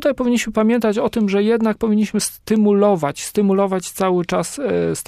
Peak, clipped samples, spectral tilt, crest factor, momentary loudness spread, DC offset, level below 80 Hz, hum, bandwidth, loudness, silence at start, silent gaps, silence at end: -4 dBFS; under 0.1%; -5.5 dB/octave; 14 dB; 5 LU; under 0.1%; -50 dBFS; none; 15.5 kHz; -18 LUFS; 0 s; none; 0.05 s